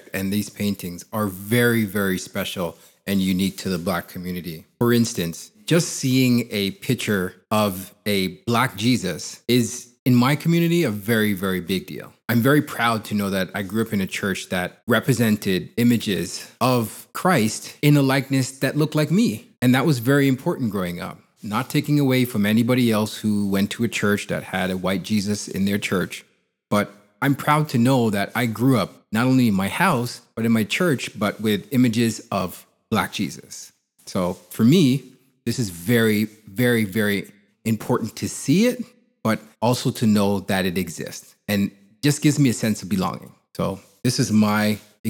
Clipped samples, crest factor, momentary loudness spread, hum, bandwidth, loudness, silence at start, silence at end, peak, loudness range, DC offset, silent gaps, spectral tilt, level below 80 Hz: under 0.1%; 20 dB; 10 LU; none; 19 kHz; -22 LUFS; 0.15 s; 0 s; -2 dBFS; 3 LU; under 0.1%; 9.99-10.06 s, 14.83-14.87 s, 44.99-45.04 s; -5.5 dB/octave; -64 dBFS